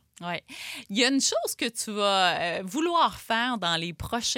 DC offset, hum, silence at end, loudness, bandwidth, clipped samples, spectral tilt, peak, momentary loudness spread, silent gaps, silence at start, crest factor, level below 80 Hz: under 0.1%; none; 0 s; -26 LUFS; 17 kHz; under 0.1%; -2.5 dB/octave; -8 dBFS; 12 LU; none; 0.2 s; 20 dB; -56 dBFS